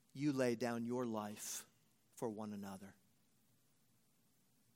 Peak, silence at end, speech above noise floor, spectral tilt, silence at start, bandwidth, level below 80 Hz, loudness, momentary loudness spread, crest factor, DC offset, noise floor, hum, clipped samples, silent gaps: -24 dBFS; 1.85 s; 35 dB; -5 dB/octave; 0.15 s; 16.5 kHz; -90 dBFS; -43 LUFS; 16 LU; 22 dB; under 0.1%; -77 dBFS; none; under 0.1%; none